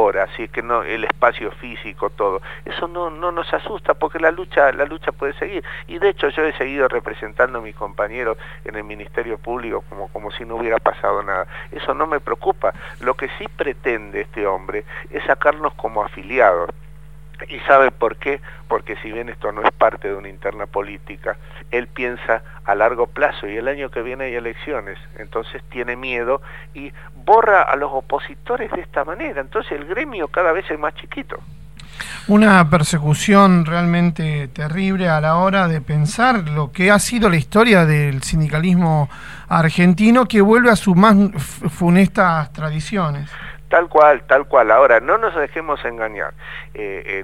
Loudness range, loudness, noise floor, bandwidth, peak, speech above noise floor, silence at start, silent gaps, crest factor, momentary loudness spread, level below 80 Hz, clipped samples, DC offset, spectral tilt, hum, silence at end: 9 LU; -18 LUFS; -40 dBFS; 14.5 kHz; 0 dBFS; 22 dB; 0 s; none; 18 dB; 16 LU; -42 dBFS; under 0.1%; 1%; -6 dB/octave; none; 0 s